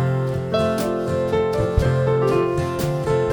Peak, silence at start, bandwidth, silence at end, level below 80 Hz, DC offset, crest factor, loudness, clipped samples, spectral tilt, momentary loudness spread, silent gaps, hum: -4 dBFS; 0 s; over 20 kHz; 0 s; -36 dBFS; under 0.1%; 16 dB; -21 LUFS; under 0.1%; -7 dB/octave; 4 LU; none; none